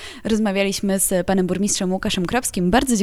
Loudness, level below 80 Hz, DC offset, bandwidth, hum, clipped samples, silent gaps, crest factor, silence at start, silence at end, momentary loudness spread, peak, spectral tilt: -20 LUFS; -40 dBFS; under 0.1%; 16.5 kHz; none; under 0.1%; none; 18 dB; 0 s; 0 s; 3 LU; -2 dBFS; -4 dB/octave